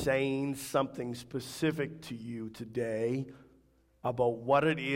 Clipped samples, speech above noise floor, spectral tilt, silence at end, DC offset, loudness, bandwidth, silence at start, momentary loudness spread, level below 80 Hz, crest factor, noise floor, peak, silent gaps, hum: under 0.1%; 34 dB; -5.5 dB/octave; 0 s; under 0.1%; -33 LUFS; 16 kHz; 0 s; 13 LU; -62 dBFS; 20 dB; -66 dBFS; -14 dBFS; none; none